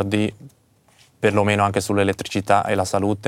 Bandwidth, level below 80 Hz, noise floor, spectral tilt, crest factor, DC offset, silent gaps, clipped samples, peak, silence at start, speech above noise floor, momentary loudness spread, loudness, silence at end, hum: 16.5 kHz; -58 dBFS; -57 dBFS; -5.5 dB/octave; 20 dB; under 0.1%; none; under 0.1%; -2 dBFS; 0 s; 38 dB; 5 LU; -20 LUFS; 0 s; none